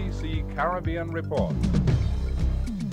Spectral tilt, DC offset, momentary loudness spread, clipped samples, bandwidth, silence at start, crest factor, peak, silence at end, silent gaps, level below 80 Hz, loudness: -8 dB/octave; under 0.1%; 6 LU; under 0.1%; 9.8 kHz; 0 s; 14 dB; -10 dBFS; 0 s; none; -30 dBFS; -27 LUFS